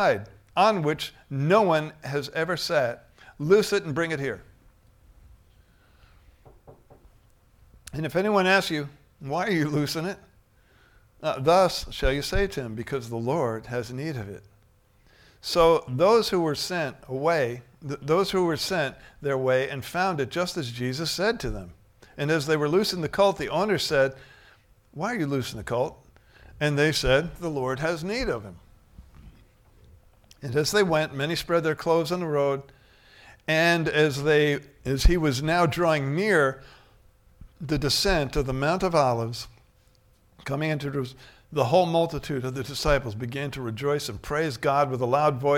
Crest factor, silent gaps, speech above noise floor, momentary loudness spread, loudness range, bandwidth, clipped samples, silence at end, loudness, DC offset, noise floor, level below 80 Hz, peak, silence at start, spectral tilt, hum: 20 dB; none; 36 dB; 12 LU; 5 LU; 17.5 kHz; under 0.1%; 0 s; -25 LUFS; under 0.1%; -60 dBFS; -40 dBFS; -6 dBFS; 0 s; -5 dB/octave; none